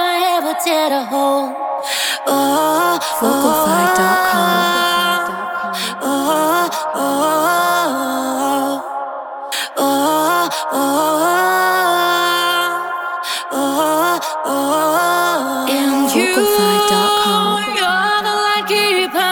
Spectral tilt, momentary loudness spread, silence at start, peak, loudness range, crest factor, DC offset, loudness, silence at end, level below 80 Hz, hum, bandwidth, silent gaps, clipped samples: -2.5 dB/octave; 7 LU; 0 s; 0 dBFS; 3 LU; 14 dB; under 0.1%; -15 LUFS; 0 s; -60 dBFS; none; over 20 kHz; none; under 0.1%